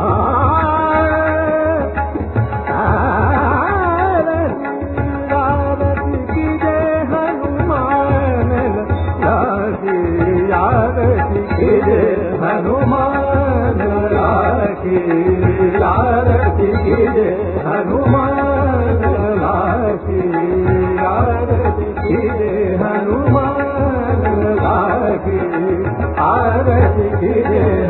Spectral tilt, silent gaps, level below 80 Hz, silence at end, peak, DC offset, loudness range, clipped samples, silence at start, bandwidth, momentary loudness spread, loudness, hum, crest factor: -14 dB/octave; none; -24 dBFS; 0 s; 0 dBFS; under 0.1%; 2 LU; under 0.1%; 0 s; 4.2 kHz; 4 LU; -15 LUFS; none; 14 dB